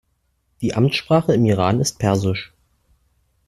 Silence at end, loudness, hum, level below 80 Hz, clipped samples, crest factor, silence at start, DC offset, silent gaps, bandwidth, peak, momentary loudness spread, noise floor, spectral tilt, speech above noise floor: 1 s; -19 LUFS; none; -50 dBFS; under 0.1%; 18 dB; 0.6 s; under 0.1%; none; 13.5 kHz; -2 dBFS; 10 LU; -67 dBFS; -6 dB/octave; 50 dB